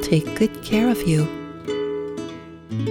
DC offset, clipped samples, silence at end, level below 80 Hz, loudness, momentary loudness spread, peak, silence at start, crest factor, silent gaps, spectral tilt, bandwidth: under 0.1%; under 0.1%; 0 s; -46 dBFS; -23 LUFS; 13 LU; -6 dBFS; 0 s; 16 dB; none; -6.5 dB/octave; 17.5 kHz